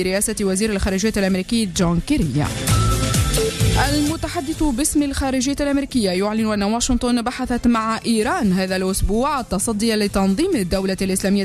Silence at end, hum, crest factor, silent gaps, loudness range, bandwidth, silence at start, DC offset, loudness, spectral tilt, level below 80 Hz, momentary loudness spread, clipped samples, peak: 0 s; none; 12 dB; none; 1 LU; 13.5 kHz; 0 s; under 0.1%; -19 LUFS; -4.5 dB/octave; -30 dBFS; 3 LU; under 0.1%; -6 dBFS